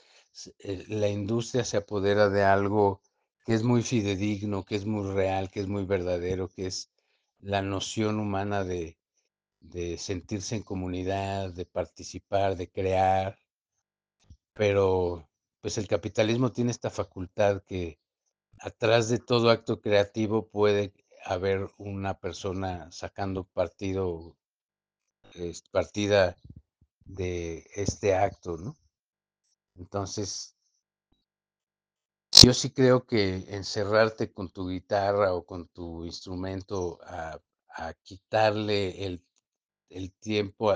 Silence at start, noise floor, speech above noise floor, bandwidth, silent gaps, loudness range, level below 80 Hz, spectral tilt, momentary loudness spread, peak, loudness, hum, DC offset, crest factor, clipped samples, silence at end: 0.35 s; -87 dBFS; 59 dB; 10 kHz; 24.61-24.69 s; 12 LU; -54 dBFS; -4.5 dB/octave; 16 LU; 0 dBFS; -27 LUFS; none; under 0.1%; 28 dB; under 0.1%; 0 s